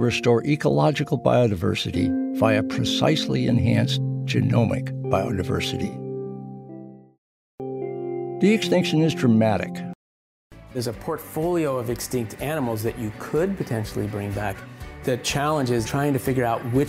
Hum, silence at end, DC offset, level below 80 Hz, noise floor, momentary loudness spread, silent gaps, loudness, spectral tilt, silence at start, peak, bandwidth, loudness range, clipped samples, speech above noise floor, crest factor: none; 0 s; under 0.1%; -48 dBFS; under -90 dBFS; 12 LU; 7.18-7.58 s, 9.95-10.50 s; -23 LUFS; -6 dB/octave; 0 s; -4 dBFS; 16 kHz; 6 LU; under 0.1%; over 68 dB; 18 dB